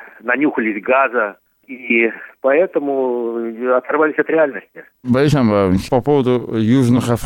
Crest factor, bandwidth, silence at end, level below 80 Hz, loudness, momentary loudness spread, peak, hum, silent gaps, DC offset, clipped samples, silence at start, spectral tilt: 14 dB; 16.5 kHz; 0 s; -46 dBFS; -16 LUFS; 8 LU; -2 dBFS; none; none; under 0.1%; under 0.1%; 0 s; -7 dB/octave